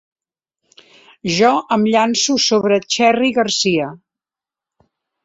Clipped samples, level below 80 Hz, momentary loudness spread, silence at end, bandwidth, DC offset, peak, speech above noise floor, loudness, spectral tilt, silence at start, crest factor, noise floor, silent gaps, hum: under 0.1%; -58 dBFS; 7 LU; 1.3 s; 8 kHz; under 0.1%; -2 dBFS; 74 dB; -15 LUFS; -3.5 dB/octave; 1.25 s; 16 dB; -89 dBFS; none; none